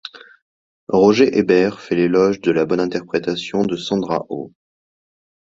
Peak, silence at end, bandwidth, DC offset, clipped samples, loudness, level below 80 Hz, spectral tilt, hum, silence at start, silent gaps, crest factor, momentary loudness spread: -2 dBFS; 1 s; 7.8 kHz; under 0.1%; under 0.1%; -17 LUFS; -56 dBFS; -6 dB/octave; none; 0.05 s; 0.42-0.87 s; 18 dB; 10 LU